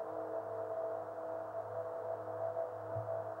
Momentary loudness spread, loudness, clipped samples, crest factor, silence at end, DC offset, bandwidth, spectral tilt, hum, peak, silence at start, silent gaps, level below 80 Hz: 3 LU; -42 LUFS; under 0.1%; 12 dB; 0 s; under 0.1%; 16 kHz; -8 dB/octave; none; -28 dBFS; 0 s; none; -82 dBFS